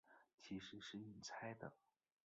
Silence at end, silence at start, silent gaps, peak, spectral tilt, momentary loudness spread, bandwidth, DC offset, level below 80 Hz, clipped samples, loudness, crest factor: 0.5 s; 0.05 s; 0.34-0.38 s; -36 dBFS; -3.5 dB/octave; 6 LU; 8 kHz; under 0.1%; -82 dBFS; under 0.1%; -54 LUFS; 20 dB